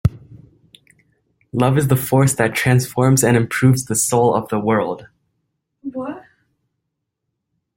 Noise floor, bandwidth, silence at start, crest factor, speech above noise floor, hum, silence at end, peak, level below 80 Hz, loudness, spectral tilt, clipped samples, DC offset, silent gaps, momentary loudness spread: -77 dBFS; 16.5 kHz; 0.05 s; 18 dB; 61 dB; none; 1.6 s; -2 dBFS; -46 dBFS; -17 LUFS; -5.5 dB/octave; under 0.1%; under 0.1%; none; 15 LU